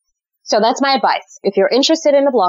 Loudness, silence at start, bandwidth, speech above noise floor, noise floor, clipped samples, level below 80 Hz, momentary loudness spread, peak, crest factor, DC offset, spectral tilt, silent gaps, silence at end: -14 LUFS; 0.45 s; 7.8 kHz; 28 dB; -42 dBFS; under 0.1%; -74 dBFS; 6 LU; -4 dBFS; 10 dB; under 0.1%; -3 dB/octave; none; 0 s